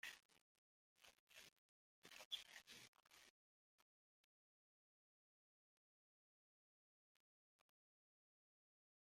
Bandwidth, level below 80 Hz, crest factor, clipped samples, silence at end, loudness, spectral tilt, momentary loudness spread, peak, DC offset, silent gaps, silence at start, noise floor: 16 kHz; under -90 dBFS; 32 dB; under 0.1%; 1.45 s; -58 LUFS; 0.5 dB/octave; 16 LU; -36 dBFS; under 0.1%; 0.25-0.29 s, 0.41-0.96 s, 1.19-1.27 s, 1.52-2.02 s, 2.25-2.31 s, 2.88-2.93 s, 3.30-7.59 s; 0.05 s; under -90 dBFS